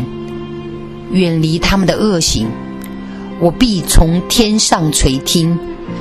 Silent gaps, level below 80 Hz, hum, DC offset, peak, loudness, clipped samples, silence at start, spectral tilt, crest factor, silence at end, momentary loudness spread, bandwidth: none; -22 dBFS; none; under 0.1%; 0 dBFS; -13 LUFS; under 0.1%; 0 s; -4.5 dB/octave; 14 dB; 0 s; 15 LU; 14 kHz